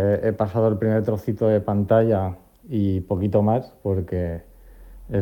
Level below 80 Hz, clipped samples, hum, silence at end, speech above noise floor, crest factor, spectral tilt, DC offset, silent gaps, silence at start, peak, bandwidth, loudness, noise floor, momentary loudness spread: -48 dBFS; under 0.1%; none; 0 s; 23 dB; 16 dB; -10 dB/octave; under 0.1%; none; 0 s; -6 dBFS; 17 kHz; -22 LUFS; -44 dBFS; 10 LU